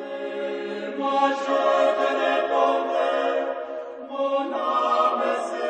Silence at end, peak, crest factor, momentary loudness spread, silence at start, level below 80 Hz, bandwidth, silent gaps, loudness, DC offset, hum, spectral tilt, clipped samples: 0 s; -8 dBFS; 16 dB; 10 LU; 0 s; -78 dBFS; 9.4 kHz; none; -23 LUFS; under 0.1%; none; -3.5 dB/octave; under 0.1%